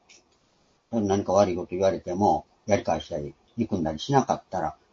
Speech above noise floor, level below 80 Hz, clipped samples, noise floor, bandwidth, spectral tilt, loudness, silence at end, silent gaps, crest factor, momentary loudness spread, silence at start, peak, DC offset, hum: 40 dB; -54 dBFS; under 0.1%; -65 dBFS; 7.6 kHz; -6 dB/octave; -26 LUFS; 0.2 s; none; 20 dB; 9 LU; 0.9 s; -6 dBFS; under 0.1%; none